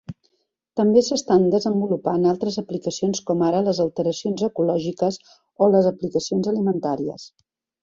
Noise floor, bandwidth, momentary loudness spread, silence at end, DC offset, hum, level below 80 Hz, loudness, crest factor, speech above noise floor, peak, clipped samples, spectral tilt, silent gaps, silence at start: -72 dBFS; 7.8 kHz; 10 LU; 0.55 s; under 0.1%; none; -60 dBFS; -21 LUFS; 18 dB; 51 dB; -4 dBFS; under 0.1%; -6 dB/octave; none; 0.1 s